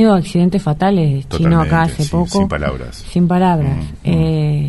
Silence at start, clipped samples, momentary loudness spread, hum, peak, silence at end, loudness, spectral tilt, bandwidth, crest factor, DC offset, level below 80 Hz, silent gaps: 0 s; under 0.1%; 7 LU; none; 0 dBFS; 0 s; -15 LUFS; -7.5 dB/octave; 11.5 kHz; 14 dB; under 0.1%; -30 dBFS; none